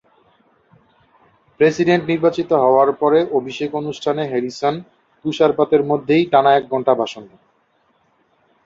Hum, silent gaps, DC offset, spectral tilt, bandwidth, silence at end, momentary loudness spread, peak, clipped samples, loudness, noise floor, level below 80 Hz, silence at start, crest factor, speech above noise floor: none; none; under 0.1%; -6.5 dB/octave; 7.6 kHz; 1.4 s; 10 LU; -2 dBFS; under 0.1%; -17 LUFS; -61 dBFS; -60 dBFS; 1.6 s; 16 dB; 45 dB